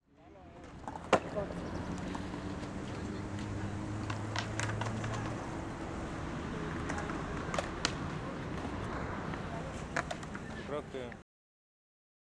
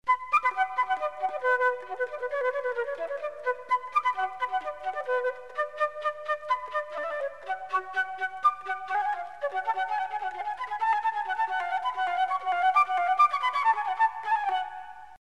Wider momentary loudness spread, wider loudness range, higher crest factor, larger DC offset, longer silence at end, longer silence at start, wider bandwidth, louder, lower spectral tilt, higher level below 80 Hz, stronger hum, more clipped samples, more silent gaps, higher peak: about the same, 8 LU vs 9 LU; second, 2 LU vs 5 LU; first, 28 dB vs 16 dB; second, under 0.1% vs 0.2%; first, 1 s vs 0.05 s; about the same, 0.15 s vs 0.05 s; about the same, 11.5 kHz vs 12 kHz; second, -39 LUFS vs -28 LUFS; first, -5.5 dB/octave vs -1.5 dB/octave; first, -50 dBFS vs -70 dBFS; neither; neither; neither; about the same, -10 dBFS vs -12 dBFS